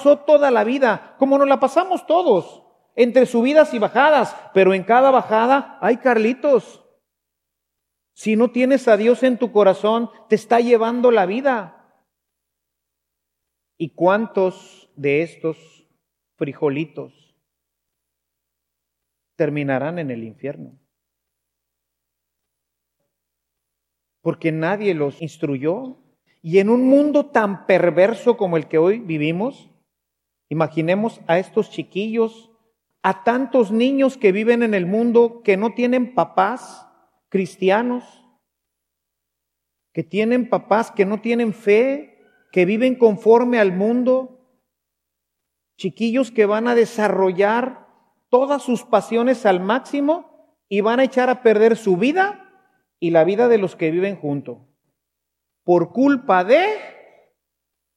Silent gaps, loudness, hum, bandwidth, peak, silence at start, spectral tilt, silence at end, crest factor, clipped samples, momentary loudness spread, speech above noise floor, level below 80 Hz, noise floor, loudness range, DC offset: none; -18 LUFS; 60 Hz at -60 dBFS; 11.5 kHz; -2 dBFS; 0 s; -6.5 dB/octave; 1.05 s; 18 dB; under 0.1%; 12 LU; 63 dB; -78 dBFS; -80 dBFS; 11 LU; under 0.1%